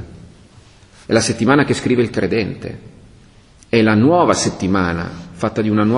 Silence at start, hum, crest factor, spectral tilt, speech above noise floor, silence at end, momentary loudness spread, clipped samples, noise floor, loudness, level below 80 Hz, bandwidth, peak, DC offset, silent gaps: 0 s; none; 18 dB; -5.5 dB/octave; 31 dB; 0 s; 16 LU; under 0.1%; -46 dBFS; -16 LUFS; -42 dBFS; 11 kHz; 0 dBFS; under 0.1%; none